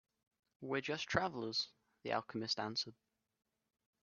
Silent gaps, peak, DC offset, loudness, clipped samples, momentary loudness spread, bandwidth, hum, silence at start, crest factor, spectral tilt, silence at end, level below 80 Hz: none; -18 dBFS; under 0.1%; -40 LUFS; under 0.1%; 9 LU; 7 kHz; none; 0.6 s; 26 dB; -2 dB/octave; 1.1 s; -72 dBFS